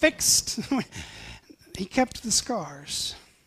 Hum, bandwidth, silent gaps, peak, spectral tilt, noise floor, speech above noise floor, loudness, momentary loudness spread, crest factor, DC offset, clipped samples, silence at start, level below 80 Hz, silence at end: none; 15.5 kHz; none; -6 dBFS; -1.5 dB/octave; -47 dBFS; 20 dB; -25 LUFS; 21 LU; 22 dB; under 0.1%; under 0.1%; 0 s; -52 dBFS; 0.25 s